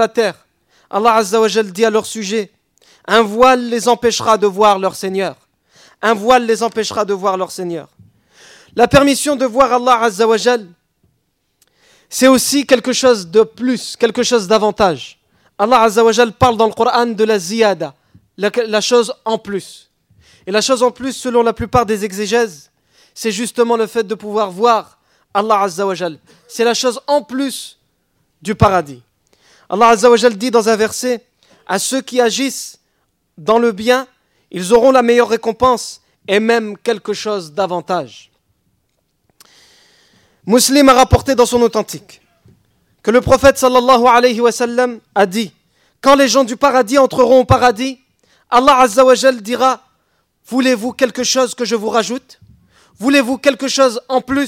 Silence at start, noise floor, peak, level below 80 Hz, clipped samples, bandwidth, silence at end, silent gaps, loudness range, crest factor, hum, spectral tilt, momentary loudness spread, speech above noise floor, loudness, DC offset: 0 s; -65 dBFS; 0 dBFS; -42 dBFS; under 0.1%; 16.5 kHz; 0 s; none; 5 LU; 14 dB; none; -4 dB/octave; 12 LU; 52 dB; -14 LUFS; under 0.1%